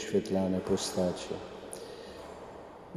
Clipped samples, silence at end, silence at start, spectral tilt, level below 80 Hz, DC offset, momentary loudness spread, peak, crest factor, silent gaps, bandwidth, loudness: under 0.1%; 0 s; 0 s; -5 dB/octave; -60 dBFS; under 0.1%; 16 LU; -16 dBFS; 18 dB; none; 15 kHz; -33 LUFS